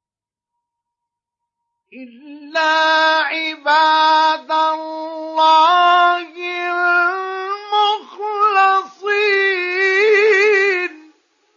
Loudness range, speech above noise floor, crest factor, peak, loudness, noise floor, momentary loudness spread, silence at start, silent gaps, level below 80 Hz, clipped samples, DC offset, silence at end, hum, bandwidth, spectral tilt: 4 LU; 74 dB; 14 dB; -2 dBFS; -15 LUFS; -90 dBFS; 12 LU; 1.95 s; none; -90 dBFS; under 0.1%; under 0.1%; 0.6 s; none; 7.4 kHz; 0 dB/octave